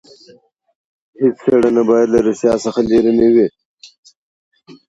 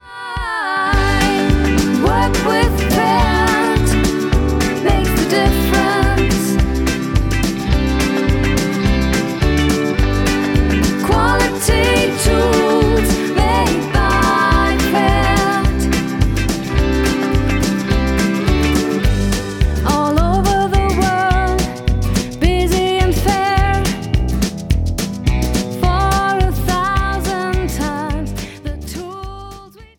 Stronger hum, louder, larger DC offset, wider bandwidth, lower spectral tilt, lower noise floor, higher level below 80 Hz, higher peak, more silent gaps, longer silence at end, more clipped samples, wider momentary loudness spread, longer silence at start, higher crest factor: neither; about the same, -14 LUFS vs -16 LUFS; neither; second, 8 kHz vs 18 kHz; about the same, -6.5 dB/octave vs -5.5 dB/octave; first, -49 dBFS vs -37 dBFS; second, -48 dBFS vs -20 dBFS; about the same, -2 dBFS vs -2 dBFS; first, 3.65-3.77 s, 3.98-4.03 s, 4.17-4.51 s vs none; about the same, 0.15 s vs 0.15 s; neither; about the same, 6 LU vs 6 LU; first, 1.2 s vs 0.05 s; about the same, 14 dB vs 12 dB